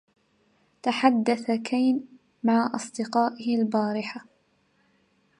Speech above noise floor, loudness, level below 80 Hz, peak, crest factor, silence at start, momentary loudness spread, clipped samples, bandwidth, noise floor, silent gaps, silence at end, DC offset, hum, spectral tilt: 43 dB; -26 LUFS; -78 dBFS; -6 dBFS; 22 dB; 0.85 s; 9 LU; under 0.1%; 11 kHz; -67 dBFS; none; 1.15 s; under 0.1%; none; -5 dB/octave